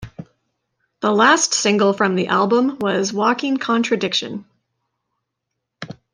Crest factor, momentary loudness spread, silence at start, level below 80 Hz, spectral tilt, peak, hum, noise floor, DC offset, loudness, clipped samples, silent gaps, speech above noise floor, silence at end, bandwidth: 18 dB; 20 LU; 0 s; -60 dBFS; -3.5 dB/octave; -2 dBFS; none; -78 dBFS; under 0.1%; -17 LUFS; under 0.1%; none; 61 dB; 0.2 s; 10.5 kHz